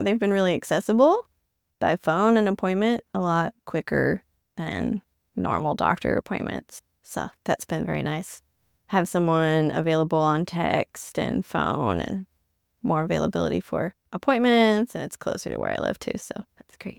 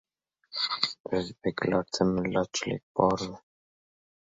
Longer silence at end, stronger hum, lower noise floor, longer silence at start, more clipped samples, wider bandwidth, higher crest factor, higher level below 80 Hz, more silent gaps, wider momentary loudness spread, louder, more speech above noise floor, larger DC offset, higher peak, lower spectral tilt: second, 0.05 s vs 0.95 s; neither; first, -74 dBFS vs -60 dBFS; second, 0 s vs 0.5 s; neither; first, 18.5 kHz vs 7.8 kHz; second, 18 dB vs 24 dB; about the same, -54 dBFS vs -58 dBFS; second, none vs 1.00-1.04 s, 2.83-2.95 s; first, 13 LU vs 7 LU; first, -25 LUFS vs -29 LUFS; first, 51 dB vs 32 dB; neither; about the same, -6 dBFS vs -6 dBFS; first, -6 dB/octave vs -4.5 dB/octave